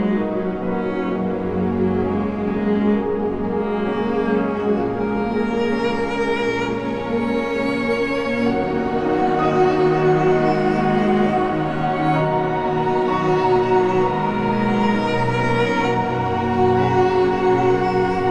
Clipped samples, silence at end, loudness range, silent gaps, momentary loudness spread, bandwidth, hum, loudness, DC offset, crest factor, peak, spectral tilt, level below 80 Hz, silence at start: under 0.1%; 0 s; 3 LU; none; 6 LU; 9.4 kHz; none; -19 LUFS; under 0.1%; 14 dB; -6 dBFS; -7.5 dB/octave; -44 dBFS; 0 s